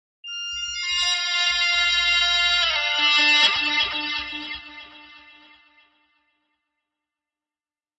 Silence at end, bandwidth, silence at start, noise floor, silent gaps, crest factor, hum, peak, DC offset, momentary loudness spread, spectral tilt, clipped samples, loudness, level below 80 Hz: 2.8 s; 9.8 kHz; 0.25 s; under -90 dBFS; none; 18 dB; none; -6 dBFS; under 0.1%; 16 LU; 0.5 dB/octave; under 0.1%; -19 LUFS; -54 dBFS